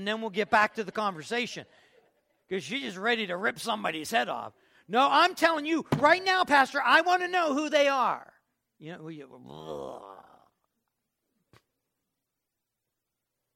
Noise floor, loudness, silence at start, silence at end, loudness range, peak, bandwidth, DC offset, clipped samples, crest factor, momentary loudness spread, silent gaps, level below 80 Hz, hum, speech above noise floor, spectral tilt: -85 dBFS; -26 LUFS; 0 s; 3.35 s; 22 LU; -8 dBFS; 16.5 kHz; under 0.1%; under 0.1%; 22 dB; 21 LU; none; -70 dBFS; none; 58 dB; -3.5 dB/octave